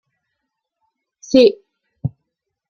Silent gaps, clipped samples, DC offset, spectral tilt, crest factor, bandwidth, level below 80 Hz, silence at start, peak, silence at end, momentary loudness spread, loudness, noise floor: none; under 0.1%; under 0.1%; -6 dB/octave; 20 dB; 7.2 kHz; -56 dBFS; 1.3 s; -2 dBFS; 0.6 s; 17 LU; -14 LUFS; -77 dBFS